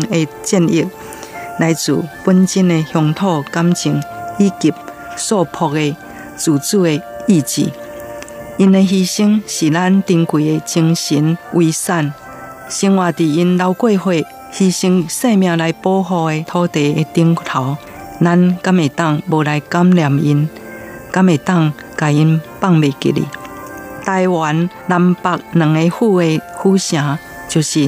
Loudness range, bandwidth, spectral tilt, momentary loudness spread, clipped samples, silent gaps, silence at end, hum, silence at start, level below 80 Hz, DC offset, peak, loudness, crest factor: 2 LU; 15.5 kHz; -6 dB/octave; 13 LU; under 0.1%; none; 0 s; none; 0 s; -54 dBFS; under 0.1%; 0 dBFS; -15 LUFS; 14 dB